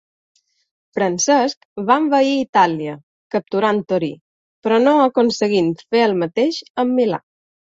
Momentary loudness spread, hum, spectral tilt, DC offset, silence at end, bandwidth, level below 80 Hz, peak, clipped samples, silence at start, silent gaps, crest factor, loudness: 12 LU; none; -4.5 dB/octave; under 0.1%; 0.6 s; 8 kHz; -64 dBFS; -2 dBFS; under 0.1%; 0.95 s; 1.57-1.76 s, 2.49-2.53 s, 3.03-3.30 s, 4.21-4.62 s, 6.70-6.75 s; 16 dB; -18 LUFS